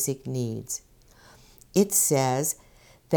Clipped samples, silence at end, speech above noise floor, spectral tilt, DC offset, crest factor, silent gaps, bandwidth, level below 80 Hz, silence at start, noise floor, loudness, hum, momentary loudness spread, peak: under 0.1%; 0 s; 29 dB; -4.5 dB/octave; under 0.1%; 20 dB; none; over 20 kHz; -60 dBFS; 0 s; -54 dBFS; -25 LUFS; none; 14 LU; -8 dBFS